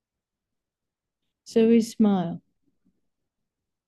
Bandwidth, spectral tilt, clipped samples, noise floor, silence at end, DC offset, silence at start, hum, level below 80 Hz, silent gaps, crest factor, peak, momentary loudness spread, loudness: 12.5 kHz; -7 dB/octave; under 0.1%; -87 dBFS; 1.5 s; under 0.1%; 1.5 s; none; -70 dBFS; none; 18 dB; -10 dBFS; 13 LU; -22 LUFS